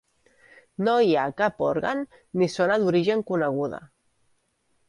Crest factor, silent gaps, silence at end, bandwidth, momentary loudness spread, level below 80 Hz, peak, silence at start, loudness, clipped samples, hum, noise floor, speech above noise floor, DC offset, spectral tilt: 16 dB; none; 1.05 s; 11.5 kHz; 11 LU; -64 dBFS; -8 dBFS; 0.8 s; -24 LUFS; under 0.1%; none; -70 dBFS; 46 dB; under 0.1%; -6.5 dB/octave